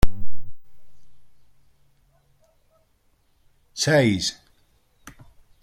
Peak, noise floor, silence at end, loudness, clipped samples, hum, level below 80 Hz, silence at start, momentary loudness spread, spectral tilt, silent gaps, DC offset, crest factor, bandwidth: -2 dBFS; -64 dBFS; 1.3 s; -22 LUFS; under 0.1%; none; -36 dBFS; 0.05 s; 29 LU; -4.5 dB/octave; none; under 0.1%; 20 dB; 16.5 kHz